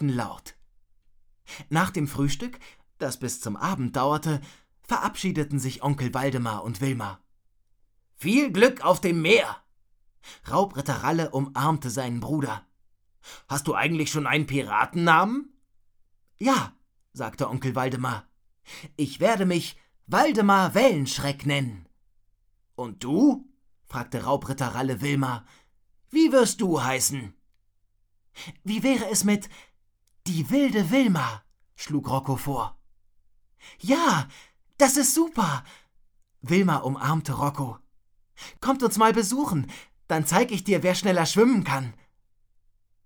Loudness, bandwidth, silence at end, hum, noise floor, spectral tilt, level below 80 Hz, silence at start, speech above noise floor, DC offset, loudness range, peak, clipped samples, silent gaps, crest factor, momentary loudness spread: -24 LUFS; over 20 kHz; 1.15 s; none; -66 dBFS; -5 dB/octave; -54 dBFS; 0 s; 42 dB; under 0.1%; 5 LU; -4 dBFS; under 0.1%; none; 22 dB; 16 LU